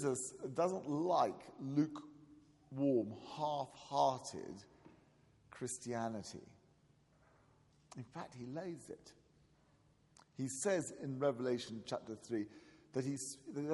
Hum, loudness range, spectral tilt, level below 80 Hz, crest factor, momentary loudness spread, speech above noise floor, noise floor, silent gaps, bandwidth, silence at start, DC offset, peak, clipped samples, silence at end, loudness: none; 14 LU; -5 dB/octave; -80 dBFS; 22 dB; 17 LU; 31 dB; -71 dBFS; none; 11.5 kHz; 0 s; under 0.1%; -20 dBFS; under 0.1%; 0 s; -40 LUFS